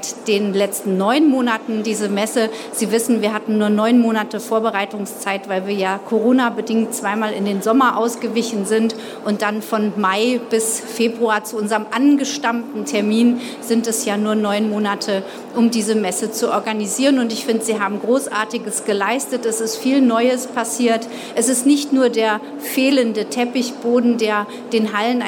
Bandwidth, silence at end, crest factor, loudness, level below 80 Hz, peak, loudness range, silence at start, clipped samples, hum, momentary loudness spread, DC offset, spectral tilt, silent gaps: 18.5 kHz; 0 s; 14 dB; -18 LUFS; -76 dBFS; -4 dBFS; 2 LU; 0 s; under 0.1%; none; 7 LU; under 0.1%; -4 dB/octave; none